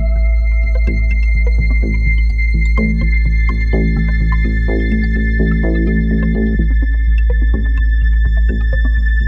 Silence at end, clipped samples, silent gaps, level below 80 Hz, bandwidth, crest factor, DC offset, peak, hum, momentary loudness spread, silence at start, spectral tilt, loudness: 0 s; under 0.1%; none; -12 dBFS; 4.5 kHz; 10 dB; under 0.1%; -2 dBFS; none; 1 LU; 0 s; -9 dB/octave; -15 LUFS